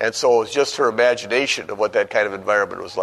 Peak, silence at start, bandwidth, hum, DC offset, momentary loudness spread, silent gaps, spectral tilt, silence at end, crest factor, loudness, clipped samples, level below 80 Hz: -4 dBFS; 0 s; 12.5 kHz; none; under 0.1%; 4 LU; none; -2.5 dB/octave; 0 s; 16 dB; -19 LUFS; under 0.1%; -62 dBFS